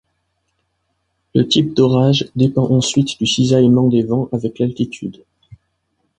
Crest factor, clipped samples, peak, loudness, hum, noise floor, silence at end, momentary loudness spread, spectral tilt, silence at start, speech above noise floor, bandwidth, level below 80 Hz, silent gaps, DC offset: 16 dB; under 0.1%; -2 dBFS; -15 LUFS; none; -69 dBFS; 1.05 s; 10 LU; -6 dB/octave; 1.35 s; 54 dB; 9.6 kHz; -50 dBFS; none; under 0.1%